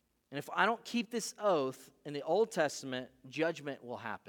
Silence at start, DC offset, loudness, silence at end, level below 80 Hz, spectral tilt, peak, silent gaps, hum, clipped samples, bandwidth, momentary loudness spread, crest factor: 0.3 s; under 0.1%; -35 LUFS; 0.1 s; -84 dBFS; -4 dB/octave; -14 dBFS; none; none; under 0.1%; 18.5 kHz; 13 LU; 22 dB